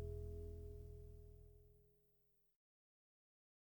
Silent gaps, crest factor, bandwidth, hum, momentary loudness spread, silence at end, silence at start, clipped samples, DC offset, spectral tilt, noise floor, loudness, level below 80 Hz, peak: none; 18 dB; 19.5 kHz; none; 15 LU; 1.65 s; 0 s; under 0.1%; under 0.1%; -9 dB/octave; -80 dBFS; -56 LUFS; -60 dBFS; -38 dBFS